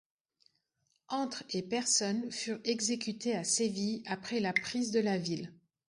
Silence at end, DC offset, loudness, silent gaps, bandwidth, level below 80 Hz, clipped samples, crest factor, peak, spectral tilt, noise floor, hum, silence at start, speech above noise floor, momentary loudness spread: 0.35 s; under 0.1%; -33 LUFS; none; 11.5 kHz; -76 dBFS; under 0.1%; 22 dB; -14 dBFS; -3 dB/octave; -79 dBFS; none; 1.1 s; 45 dB; 9 LU